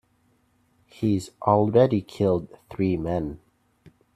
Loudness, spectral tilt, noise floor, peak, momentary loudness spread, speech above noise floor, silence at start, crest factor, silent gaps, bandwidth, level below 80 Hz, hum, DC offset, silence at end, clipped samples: -24 LUFS; -8 dB/octave; -66 dBFS; -6 dBFS; 12 LU; 43 dB; 1 s; 20 dB; none; 13 kHz; -54 dBFS; none; under 0.1%; 0.8 s; under 0.1%